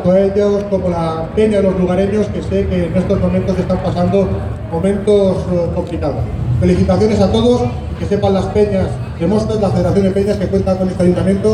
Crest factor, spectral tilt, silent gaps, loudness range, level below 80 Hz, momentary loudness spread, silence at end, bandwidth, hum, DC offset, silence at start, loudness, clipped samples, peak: 12 dB; -8 dB/octave; none; 1 LU; -28 dBFS; 6 LU; 0 s; 10.5 kHz; none; under 0.1%; 0 s; -15 LUFS; under 0.1%; 0 dBFS